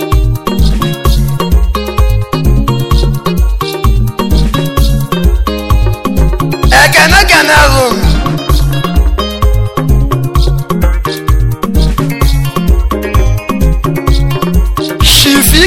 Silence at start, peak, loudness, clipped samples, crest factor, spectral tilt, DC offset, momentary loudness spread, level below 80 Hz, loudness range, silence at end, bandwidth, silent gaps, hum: 0 s; 0 dBFS; -10 LUFS; 0.5%; 8 dB; -4.5 dB/octave; 2%; 8 LU; -12 dBFS; 5 LU; 0 s; 17 kHz; none; none